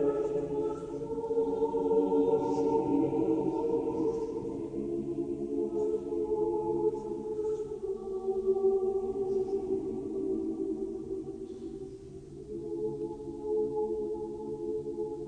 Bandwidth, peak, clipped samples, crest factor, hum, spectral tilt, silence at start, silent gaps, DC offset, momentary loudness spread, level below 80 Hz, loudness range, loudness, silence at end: 9.6 kHz; -16 dBFS; under 0.1%; 16 dB; none; -9 dB/octave; 0 s; none; under 0.1%; 10 LU; -58 dBFS; 7 LU; -32 LUFS; 0 s